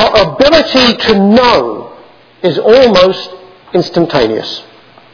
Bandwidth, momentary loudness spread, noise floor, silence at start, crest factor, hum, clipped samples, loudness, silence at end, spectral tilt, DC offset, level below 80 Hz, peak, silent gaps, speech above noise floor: 5.4 kHz; 14 LU; -38 dBFS; 0 s; 10 dB; none; 2%; -9 LUFS; 0.5 s; -5.5 dB/octave; under 0.1%; -36 dBFS; 0 dBFS; none; 30 dB